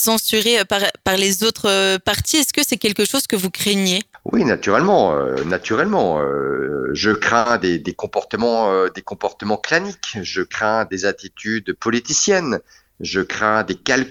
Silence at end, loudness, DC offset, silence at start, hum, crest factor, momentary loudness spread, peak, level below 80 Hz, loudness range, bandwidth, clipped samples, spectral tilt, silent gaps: 0 s; -18 LUFS; under 0.1%; 0 s; none; 18 dB; 8 LU; 0 dBFS; -50 dBFS; 4 LU; over 20 kHz; under 0.1%; -3 dB/octave; none